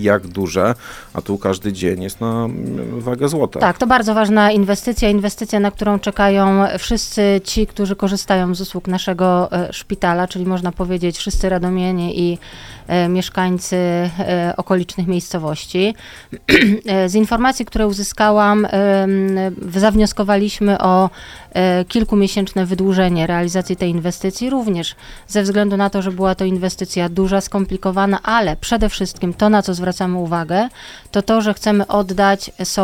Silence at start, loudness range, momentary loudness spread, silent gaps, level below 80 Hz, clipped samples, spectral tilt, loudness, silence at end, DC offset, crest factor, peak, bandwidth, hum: 0 s; 4 LU; 8 LU; none; -34 dBFS; under 0.1%; -5.5 dB/octave; -17 LUFS; 0 s; under 0.1%; 16 dB; 0 dBFS; 16.5 kHz; none